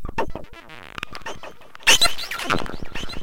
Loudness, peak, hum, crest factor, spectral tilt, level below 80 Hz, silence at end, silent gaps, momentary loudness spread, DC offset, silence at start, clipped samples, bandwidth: -20 LUFS; -2 dBFS; none; 20 dB; -1 dB/octave; -38 dBFS; 0 s; none; 24 LU; under 0.1%; 0 s; under 0.1%; 17 kHz